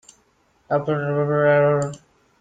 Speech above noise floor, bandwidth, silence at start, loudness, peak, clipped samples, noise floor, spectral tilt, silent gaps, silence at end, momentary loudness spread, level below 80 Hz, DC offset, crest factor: 43 dB; 9.2 kHz; 0.7 s; -20 LUFS; -6 dBFS; under 0.1%; -62 dBFS; -7.5 dB/octave; none; 0.45 s; 8 LU; -60 dBFS; under 0.1%; 16 dB